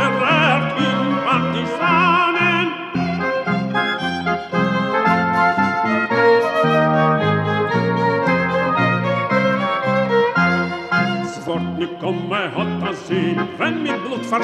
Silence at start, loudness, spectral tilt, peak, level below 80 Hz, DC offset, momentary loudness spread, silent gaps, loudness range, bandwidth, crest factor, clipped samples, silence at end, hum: 0 s; -18 LUFS; -6.5 dB/octave; -4 dBFS; -54 dBFS; under 0.1%; 8 LU; none; 4 LU; 11.5 kHz; 14 dB; under 0.1%; 0 s; none